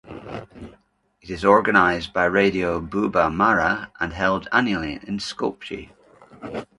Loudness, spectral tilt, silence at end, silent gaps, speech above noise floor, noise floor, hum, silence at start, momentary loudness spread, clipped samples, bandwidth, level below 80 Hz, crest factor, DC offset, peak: -21 LUFS; -5.5 dB/octave; 0.15 s; none; 40 dB; -61 dBFS; none; 0.05 s; 18 LU; under 0.1%; 11.5 kHz; -46 dBFS; 22 dB; under 0.1%; 0 dBFS